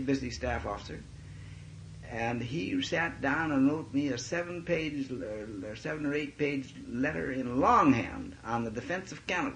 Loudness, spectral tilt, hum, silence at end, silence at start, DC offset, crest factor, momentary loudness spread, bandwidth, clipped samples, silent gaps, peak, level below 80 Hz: -32 LUFS; -5.5 dB/octave; none; 0 s; 0 s; under 0.1%; 20 dB; 17 LU; 9.8 kHz; under 0.1%; none; -12 dBFS; -54 dBFS